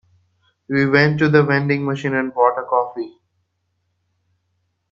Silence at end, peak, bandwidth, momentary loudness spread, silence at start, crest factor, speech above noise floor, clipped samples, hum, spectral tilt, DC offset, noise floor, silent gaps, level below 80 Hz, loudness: 1.8 s; 0 dBFS; 7.4 kHz; 10 LU; 0.7 s; 20 dB; 54 dB; under 0.1%; none; -8 dB/octave; under 0.1%; -71 dBFS; none; -60 dBFS; -17 LUFS